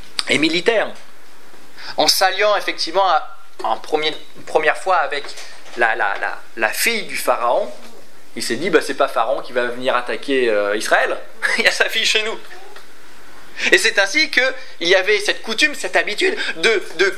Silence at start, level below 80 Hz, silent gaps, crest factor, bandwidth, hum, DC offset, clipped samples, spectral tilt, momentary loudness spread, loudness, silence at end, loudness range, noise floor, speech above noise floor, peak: 0.15 s; -68 dBFS; none; 20 dB; 16 kHz; none; 5%; under 0.1%; -1.5 dB/octave; 12 LU; -17 LUFS; 0 s; 4 LU; -46 dBFS; 28 dB; 0 dBFS